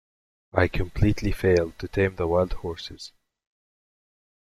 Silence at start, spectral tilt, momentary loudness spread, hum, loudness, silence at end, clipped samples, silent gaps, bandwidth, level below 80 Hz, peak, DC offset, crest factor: 0.55 s; -7 dB/octave; 14 LU; none; -25 LUFS; 1.35 s; under 0.1%; none; 13.5 kHz; -38 dBFS; -4 dBFS; under 0.1%; 22 dB